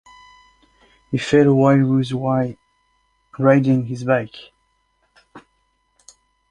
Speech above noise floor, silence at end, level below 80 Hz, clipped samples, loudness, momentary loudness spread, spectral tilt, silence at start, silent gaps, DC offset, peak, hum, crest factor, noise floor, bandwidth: 49 dB; 1.1 s; -56 dBFS; under 0.1%; -18 LUFS; 13 LU; -8 dB/octave; 1.1 s; none; under 0.1%; -2 dBFS; none; 18 dB; -66 dBFS; 9.6 kHz